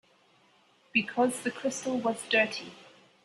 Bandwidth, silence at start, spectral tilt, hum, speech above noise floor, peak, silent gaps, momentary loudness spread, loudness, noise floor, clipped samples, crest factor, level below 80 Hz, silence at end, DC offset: 12.5 kHz; 0.95 s; -3 dB/octave; none; 35 dB; -12 dBFS; none; 7 LU; -29 LUFS; -64 dBFS; under 0.1%; 20 dB; -78 dBFS; 0.4 s; under 0.1%